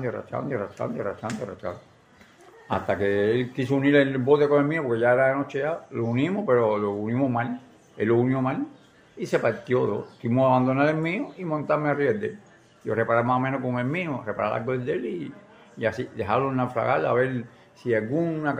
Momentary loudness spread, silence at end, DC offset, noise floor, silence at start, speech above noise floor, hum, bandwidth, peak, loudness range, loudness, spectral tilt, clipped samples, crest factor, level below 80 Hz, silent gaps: 12 LU; 0 s; under 0.1%; -54 dBFS; 0 s; 30 dB; none; 10 kHz; -6 dBFS; 5 LU; -25 LUFS; -8 dB/octave; under 0.1%; 20 dB; -64 dBFS; none